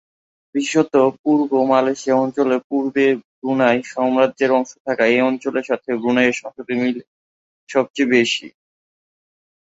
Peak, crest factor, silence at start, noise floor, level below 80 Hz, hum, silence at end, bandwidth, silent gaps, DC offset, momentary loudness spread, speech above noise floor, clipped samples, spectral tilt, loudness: -2 dBFS; 18 dB; 0.55 s; under -90 dBFS; -66 dBFS; none; 1.15 s; 8 kHz; 1.19-1.24 s, 2.64-2.70 s, 3.25-3.42 s, 4.80-4.85 s, 7.07-7.67 s, 7.90-7.94 s; under 0.1%; 8 LU; over 72 dB; under 0.1%; -4.5 dB/octave; -18 LUFS